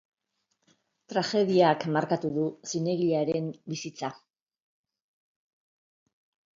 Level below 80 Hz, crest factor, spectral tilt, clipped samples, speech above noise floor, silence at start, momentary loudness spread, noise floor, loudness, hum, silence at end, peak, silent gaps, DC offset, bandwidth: -76 dBFS; 22 dB; -5.5 dB/octave; under 0.1%; 51 dB; 1.1 s; 14 LU; -78 dBFS; -28 LUFS; none; 2.45 s; -8 dBFS; none; under 0.1%; 7.6 kHz